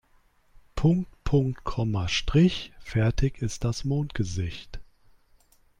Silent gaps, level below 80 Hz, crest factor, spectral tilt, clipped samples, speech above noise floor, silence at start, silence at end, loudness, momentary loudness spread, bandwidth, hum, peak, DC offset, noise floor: none; -38 dBFS; 16 dB; -6 dB/octave; under 0.1%; 37 dB; 0.75 s; 1 s; -27 LUFS; 12 LU; 11 kHz; none; -10 dBFS; under 0.1%; -62 dBFS